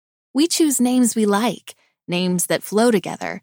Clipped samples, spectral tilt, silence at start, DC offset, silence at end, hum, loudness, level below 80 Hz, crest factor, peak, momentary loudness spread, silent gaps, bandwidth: under 0.1%; -4 dB/octave; 0.35 s; under 0.1%; 0.05 s; none; -19 LUFS; -72 dBFS; 16 dB; -4 dBFS; 10 LU; none; 20 kHz